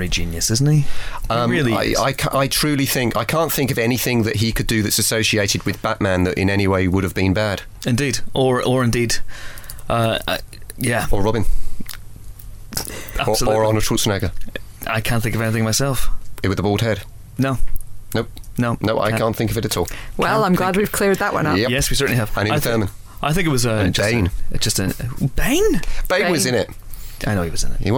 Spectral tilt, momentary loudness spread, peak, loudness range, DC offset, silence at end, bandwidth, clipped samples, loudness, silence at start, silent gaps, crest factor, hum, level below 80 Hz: -4.5 dB/octave; 11 LU; -6 dBFS; 4 LU; under 0.1%; 0 s; 19 kHz; under 0.1%; -19 LUFS; 0 s; none; 12 dB; none; -28 dBFS